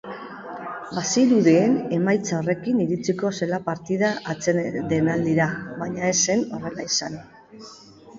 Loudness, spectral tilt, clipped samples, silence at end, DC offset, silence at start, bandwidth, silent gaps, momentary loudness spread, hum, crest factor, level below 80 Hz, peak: -22 LUFS; -4.5 dB/octave; under 0.1%; 0 s; under 0.1%; 0.05 s; 7.8 kHz; none; 17 LU; none; 18 dB; -60 dBFS; -6 dBFS